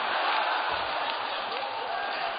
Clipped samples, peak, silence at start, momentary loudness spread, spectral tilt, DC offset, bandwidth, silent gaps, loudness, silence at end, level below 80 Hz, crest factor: under 0.1%; -14 dBFS; 0 s; 6 LU; 2 dB/octave; under 0.1%; 5 kHz; none; -29 LUFS; 0 s; -66 dBFS; 16 dB